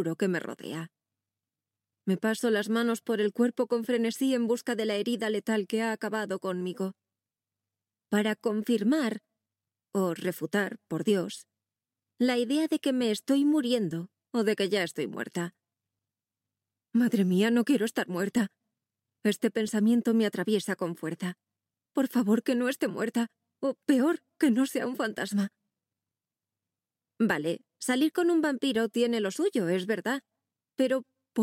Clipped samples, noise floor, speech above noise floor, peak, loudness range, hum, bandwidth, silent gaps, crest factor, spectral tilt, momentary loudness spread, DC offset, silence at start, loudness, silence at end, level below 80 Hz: under 0.1%; under -90 dBFS; over 62 dB; -12 dBFS; 4 LU; none; 16.5 kHz; none; 18 dB; -5.5 dB/octave; 9 LU; under 0.1%; 0 s; -29 LUFS; 0 s; -80 dBFS